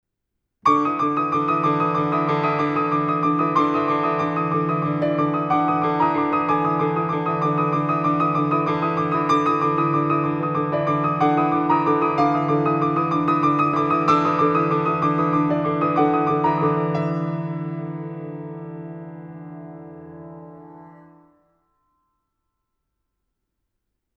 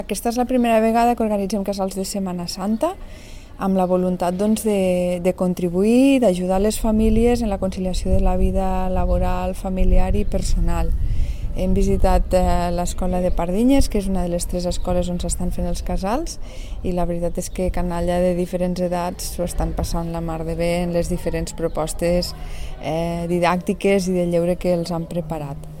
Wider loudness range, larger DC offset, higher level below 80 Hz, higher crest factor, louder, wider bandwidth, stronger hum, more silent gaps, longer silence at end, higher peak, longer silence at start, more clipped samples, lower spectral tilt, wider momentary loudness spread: first, 12 LU vs 5 LU; second, under 0.1% vs 0.4%; second, -60 dBFS vs -24 dBFS; about the same, 16 dB vs 16 dB; about the same, -20 LUFS vs -21 LUFS; second, 6.6 kHz vs 16.5 kHz; neither; neither; first, 3.25 s vs 0 s; about the same, -4 dBFS vs -4 dBFS; first, 0.65 s vs 0 s; neither; first, -8.5 dB/octave vs -6 dB/octave; first, 15 LU vs 9 LU